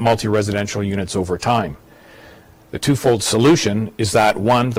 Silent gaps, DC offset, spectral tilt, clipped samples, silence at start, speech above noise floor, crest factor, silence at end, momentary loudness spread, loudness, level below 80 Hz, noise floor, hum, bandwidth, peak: none; under 0.1%; -5 dB/octave; under 0.1%; 0 s; 27 dB; 12 dB; 0 s; 8 LU; -17 LUFS; -46 dBFS; -44 dBFS; none; 16.5 kHz; -6 dBFS